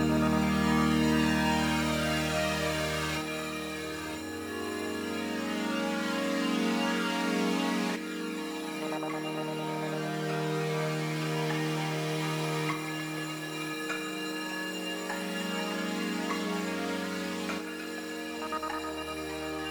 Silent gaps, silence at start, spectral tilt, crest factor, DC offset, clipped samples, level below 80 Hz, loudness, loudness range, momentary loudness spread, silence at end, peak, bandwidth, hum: none; 0 s; -4.5 dB/octave; 16 dB; under 0.1%; under 0.1%; -52 dBFS; -31 LUFS; 5 LU; 9 LU; 0 s; -14 dBFS; over 20 kHz; none